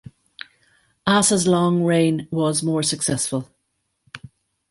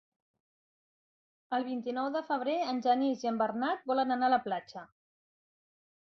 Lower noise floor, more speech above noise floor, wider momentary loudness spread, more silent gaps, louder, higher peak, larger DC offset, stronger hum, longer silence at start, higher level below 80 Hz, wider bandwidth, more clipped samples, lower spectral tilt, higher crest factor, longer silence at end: second, -73 dBFS vs under -90 dBFS; second, 54 dB vs over 59 dB; first, 24 LU vs 8 LU; neither; first, -19 LUFS vs -32 LUFS; first, -2 dBFS vs -16 dBFS; neither; neither; second, 1.05 s vs 1.5 s; first, -56 dBFS vs -80 dBFS; first, 12 kHz vs 6.4 kHz; neither; about the same, -4.5 dB/octave vs -5 dB/octave; about the same, 20 dB vs 18 dB; second, 0.55 s vs 1.2 s